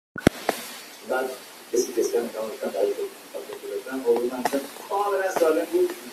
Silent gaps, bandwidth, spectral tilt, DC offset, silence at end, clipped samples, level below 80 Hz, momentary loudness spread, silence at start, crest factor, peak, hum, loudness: none; 16 kHz; -4.5 dB/octave; under 0.1%; 0 s; under 0.1%; -54 dBFS; 12 LU; 0.15 s; 24 dB; -2 dBFS; none; -26 LUFS